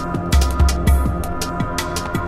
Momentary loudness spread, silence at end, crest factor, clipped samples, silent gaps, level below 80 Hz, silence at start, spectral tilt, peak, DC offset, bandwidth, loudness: 7 LU; 0 s; 14 dB; under 0.1%; none; -20 dBFS; 0 s; -5.5 dB/octave; -4 dBFS; under 0.1%; 15.5 kHz; -19 LUFS